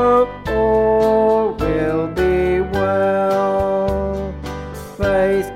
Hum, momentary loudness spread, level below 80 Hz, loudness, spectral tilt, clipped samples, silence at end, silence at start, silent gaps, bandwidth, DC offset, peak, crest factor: none; 11 LU; -34 dBFS; -17 LUFS; -7 dB/octave; under 0.1%; 0 s; 0 s; none; 15.5 kHz; under 0.1%; -4 dBFS; 12 dB